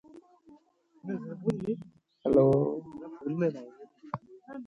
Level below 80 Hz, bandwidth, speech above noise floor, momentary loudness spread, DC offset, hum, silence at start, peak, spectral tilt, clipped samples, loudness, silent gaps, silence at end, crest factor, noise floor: -62 dBFS; 10 kHz; 35 dB; 21 LU; under 0.1%; none; 0.15 s; -12 dBFS; -10 dB/octave; under 0.1%; -30 LUFS; none; 0 s; 20 dB; -63 dBFS